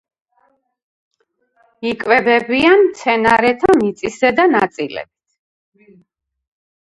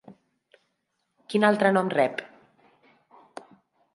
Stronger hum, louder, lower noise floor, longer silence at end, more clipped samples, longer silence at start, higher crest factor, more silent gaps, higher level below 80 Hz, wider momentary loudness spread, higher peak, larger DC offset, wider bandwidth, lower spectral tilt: neither; first, -14 LUFS vs -23 LUFS; second, -62 dBFS vs -77 dBFS; first, 1.85 s vs 1.7 s; neither; first, 1.8 s vs 0.1 s; second, 16 dB vs 22 dB; neither; first, -52 dBFS vs -78 dBFS; second, 13 LU vs 26 LU; first, 0 dBFS vs -6 dBFS; neither; about the same, 11.5 kHz vs 11.5 kHz; about the same, -5 dB/octave vs -6 dB/octave